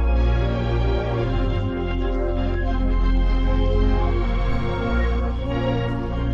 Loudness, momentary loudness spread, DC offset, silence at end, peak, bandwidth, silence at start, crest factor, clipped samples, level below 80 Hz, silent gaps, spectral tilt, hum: -23 LUFS; 4 LU; under 0.1%; 0 s; -8 dBFS; 5.8 kHz; 0 s; 12 dB; under 0.1%; -22 dBFS; none; -8.5 dB/octave; none